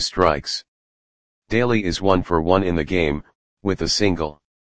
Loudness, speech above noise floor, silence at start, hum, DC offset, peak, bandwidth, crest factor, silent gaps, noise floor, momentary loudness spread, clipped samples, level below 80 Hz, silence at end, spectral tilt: -21 LUFS; over 70 dB; 0 s; none; 1%; 0 dBFS; 10 kHz; 20 dB; 0.68-1.42 s, 3.35-3.57 s; under -90 dBFS; 10 LU; under 0.1%; -40 dBFS; 0.25 s; -5 dB/octave